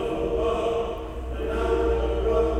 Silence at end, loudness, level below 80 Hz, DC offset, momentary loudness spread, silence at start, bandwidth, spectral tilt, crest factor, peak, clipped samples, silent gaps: 0 s; -26 LUFS; -32 dBFS; under 0.1%; 8 LU; 0 s; 10.5 kHz; -7 dB/octave; 12 dB; -12 dBFS; under 0.1%; none